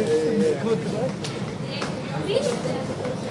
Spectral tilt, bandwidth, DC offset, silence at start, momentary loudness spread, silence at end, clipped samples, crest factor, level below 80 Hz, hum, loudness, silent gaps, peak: -6 dB/octave; 11.5 kHz; under 0.1%; 0 s; 8 LU; 0 s; under 0.1%; 16 dB; -56 dBFS; none; -25 LUFS; none; -8 dBFS